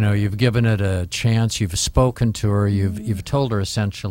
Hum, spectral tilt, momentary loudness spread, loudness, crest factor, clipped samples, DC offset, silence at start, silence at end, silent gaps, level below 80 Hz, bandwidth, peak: none; -5.5 dB/octave; 5 LU; -20 LUFS; 16 dB; under 0.1%; under 0.1%; 0 s; 0 s; none; -36 dBFS; 16.5 kHz; -4 dBFS